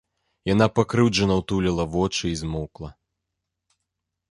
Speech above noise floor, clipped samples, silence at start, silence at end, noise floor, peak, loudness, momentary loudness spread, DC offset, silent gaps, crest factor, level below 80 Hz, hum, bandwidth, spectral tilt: 60 dB; under 0.1%; 0.45 s; 1.4 s; -82 dBFS; -4 dBFS; -23 LUFS; 14 LU; under 0.1%; none; 22 dB; -42 dBFS; none; 11.5 kHz; -5.5 dB/octave